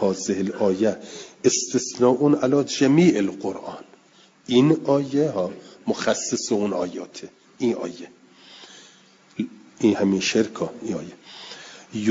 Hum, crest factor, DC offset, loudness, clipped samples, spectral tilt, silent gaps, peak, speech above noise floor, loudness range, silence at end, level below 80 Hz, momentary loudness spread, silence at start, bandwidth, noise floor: none; 18 dB; under 0.1%; -22 LUFS; under 0.1%; -5 dB/octave; none; -4 dBFS; 33 dB; 7 LU; 0 s; -66 dBFS; 20 LU; 0 s; 7.8 kHz; -55 dBFS